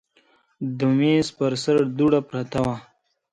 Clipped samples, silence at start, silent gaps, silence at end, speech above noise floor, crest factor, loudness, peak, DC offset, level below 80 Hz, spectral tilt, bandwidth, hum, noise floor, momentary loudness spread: under 0.1%; 0.6 s; none; 0.5 s; 40 dB; 16 dB; -22 LUFS; -6 dBFS; under 0.1%; -54 dBFS; -6.5 dB/octave; 10.5 kHz; none; -61 dBFS; 11 LU